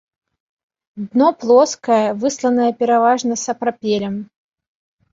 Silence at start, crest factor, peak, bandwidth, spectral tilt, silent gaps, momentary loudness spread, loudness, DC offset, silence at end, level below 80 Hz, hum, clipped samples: 0.95 s; 16 dB; -2 dBFS; 7.8 kHz; -4.5 dB/octave; none; 8 LU; -17 LUFS; under 0.1%; 0.9 s; -64 dBFS; none; under 0.1%